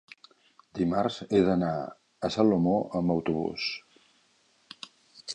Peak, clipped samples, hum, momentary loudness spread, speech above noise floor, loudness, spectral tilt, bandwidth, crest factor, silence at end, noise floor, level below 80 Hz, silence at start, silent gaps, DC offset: -10 dBFS; under 0.1%; none; 21 LU; 40 dB; -28 LUFS; -6.5 dB/octave; 10 kHz; 20 dB; 0 s; -66 dBFS; -58 dBFS; 0.75 s; none; under 0.1%